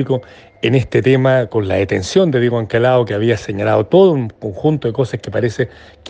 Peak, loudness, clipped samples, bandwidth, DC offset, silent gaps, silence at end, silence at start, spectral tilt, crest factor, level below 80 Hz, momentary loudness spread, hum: 0 dBFS; -15 LUFS; under 0.1%; 9.2 kHz; under 0.1%; none; 0 s; 0 s; -7 dB/octave; 14 dB; -46 dBFS; 8 LU; none